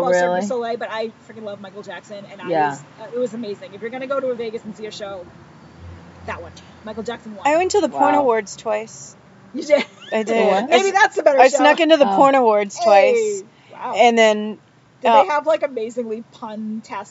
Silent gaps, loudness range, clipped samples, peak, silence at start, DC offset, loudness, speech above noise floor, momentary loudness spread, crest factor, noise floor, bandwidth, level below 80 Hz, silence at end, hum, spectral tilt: none; 14 LU; under 0.1%; 0 dBFS; 0 s; under 0.1%; -17 LUFS; 21 dB; 21 LU; 18 dB; -39 dBFS; 8 kHz; -62 dBFS; 0.05 s; none; -3.5 dB/octave